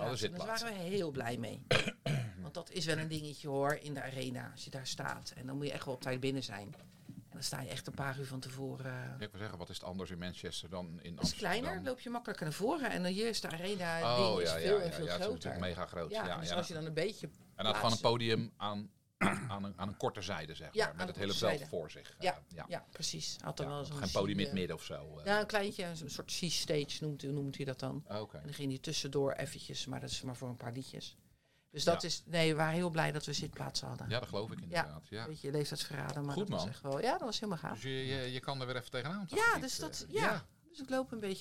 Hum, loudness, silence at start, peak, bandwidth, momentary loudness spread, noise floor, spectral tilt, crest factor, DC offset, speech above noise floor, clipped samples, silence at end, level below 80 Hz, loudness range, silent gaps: none; -38 LUFS; 0 s; -16 dBFS; 16.5 kHz; 11 LU; -71 dBFS; -4.5 dB/octave; 22 dB; 0.1%; 33 dB; under 0.1%; 0 s; -64 dBFS; 6 LU; none